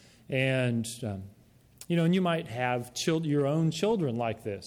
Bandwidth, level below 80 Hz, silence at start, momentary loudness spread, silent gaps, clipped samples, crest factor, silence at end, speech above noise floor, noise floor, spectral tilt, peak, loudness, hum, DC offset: 16 kHz; -66 dBFS; 0.3 s; 8 LU; none; under 0.1%; 16 dB; 0 s; 26 dB; -54 dBFS; -6 dB/octave; -14 dBFS; -29 LUFS; none; under 0.1%